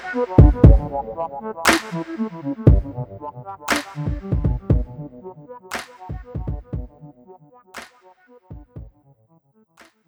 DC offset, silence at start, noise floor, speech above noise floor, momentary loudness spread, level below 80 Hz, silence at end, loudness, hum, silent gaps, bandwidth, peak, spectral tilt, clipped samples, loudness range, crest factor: under 0.1%; 0 s; -58 dBFS; 40 dB; 25 LU; -24 dBFS; 1.2 s; -20 LUFS; none; none; over 20 kHz; 0 dBFS; -6 dB/octave; under 0.1%; 18 LU; 20 dB